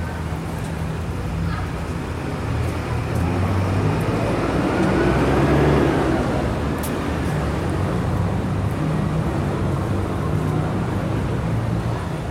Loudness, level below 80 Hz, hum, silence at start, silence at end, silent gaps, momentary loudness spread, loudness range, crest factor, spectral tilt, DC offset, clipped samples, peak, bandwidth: -22 LUFS; -32 dBFS; none; 0 s; 0 s; none; 8 LU; 4 LU; 16 dB; -7 dB/octave; 0.2%; under 0.1%; -4 dBFS; 16 kHz